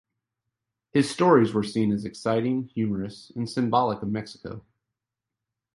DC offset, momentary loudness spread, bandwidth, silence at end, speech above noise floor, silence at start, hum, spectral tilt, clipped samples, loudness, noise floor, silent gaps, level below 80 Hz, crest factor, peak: under 0.1%; 16 LU; 11.5 kHz; 1.15 s; 63 dB; 0.95 s; none; -6.5 dB/octave; under 0.1%; -25 LUFS; -87 dBFS; none; -60 dBFS; 20 dB; -6 dBFS